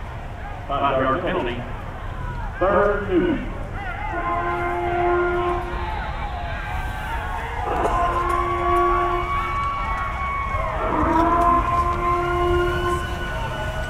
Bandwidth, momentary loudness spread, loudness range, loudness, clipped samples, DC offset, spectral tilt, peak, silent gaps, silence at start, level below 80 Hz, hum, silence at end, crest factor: 15 kHz; 12 LU; 4 LU; -23 LUFS; under 0.1%; under 0.1%; -6.5 dB/octave; -6 dBFS; none; 0 s; -30 dBFS; none; 0 s; 16 dB